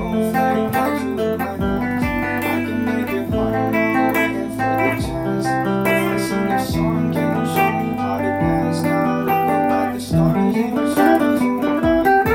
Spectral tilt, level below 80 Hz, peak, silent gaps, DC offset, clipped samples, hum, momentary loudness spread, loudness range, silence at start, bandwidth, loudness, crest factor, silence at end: -6.5 dB/octave; -40 dBFS; -2 dBFS; none; under 0.1%; under 0.1%; none; 5 LU; 3 LU; 0 s; 17 kHz; -19 LUFS; 16 dB; 0 s